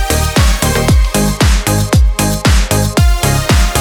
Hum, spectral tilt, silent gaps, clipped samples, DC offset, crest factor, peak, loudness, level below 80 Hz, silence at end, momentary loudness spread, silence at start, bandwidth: none; -4.5 dB/octave; none; under 0.1%; under 0.1%; 10 dB; 0 dBFS; -12 LUFS; -14 dBFS; 0 s; 2 LU; 0 s; 19 kHz